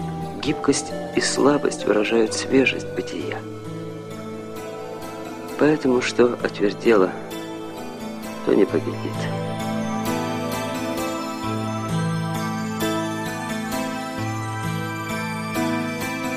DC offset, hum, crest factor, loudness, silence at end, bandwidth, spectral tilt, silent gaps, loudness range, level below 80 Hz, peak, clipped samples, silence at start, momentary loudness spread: under 0.1%; none; 20 dB; -24 LUFS; 0 s; 15.5 kHz; -5 dB/octave; none; 5 LU; -52 dBFS; -4 dBFS; under 0.1%; 0 s; 14 LU